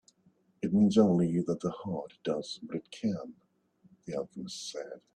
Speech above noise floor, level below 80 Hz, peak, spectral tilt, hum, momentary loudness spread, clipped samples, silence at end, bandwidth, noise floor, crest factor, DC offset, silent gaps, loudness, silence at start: 38 dB; -68 dBFS; -12 dBFS; -7 dB/octave; none; 15 LU; under 0.1%; 0.15 s; 10 kHz; -68 dBFS; 20 dB; under 0.1%; none; -31 LUFS; 0.6 s